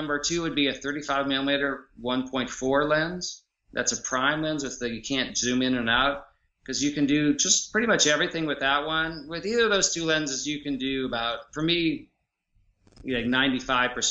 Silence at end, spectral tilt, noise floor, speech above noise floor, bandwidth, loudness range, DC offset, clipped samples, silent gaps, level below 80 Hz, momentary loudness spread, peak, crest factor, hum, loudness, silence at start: 0 s; -2.5 dB/octave; -70 dBFS; 44 dB; 8.2 kHz; 4 LU; under 0.1%; under 0.1%; none; -52 dBFS; 10 LU; -6 dBFS; 20 dB; none; -25 LUFS; 0 s